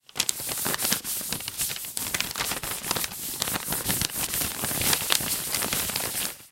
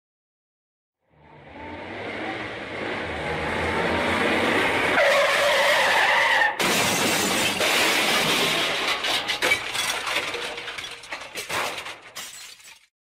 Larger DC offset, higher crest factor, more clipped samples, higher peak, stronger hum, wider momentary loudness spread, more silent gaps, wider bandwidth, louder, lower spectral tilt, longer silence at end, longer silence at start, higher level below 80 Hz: neither; first, 28 dB vs 16 dB; neither; first, 0 dBFS vs -8 dBFS; neither; second, 6 LU vs 17 LU; neither; about the same, 17 kHz vs 16 kHz; second, -26 LUFS vs -21 LUFS; about the same, -1 dB/octave vs -2 dB/octave; second, 0.05 s vs 0.3 s; second, 0.15 s vs 1.35 s; about the same, -50 dBFS vs -52 dBFS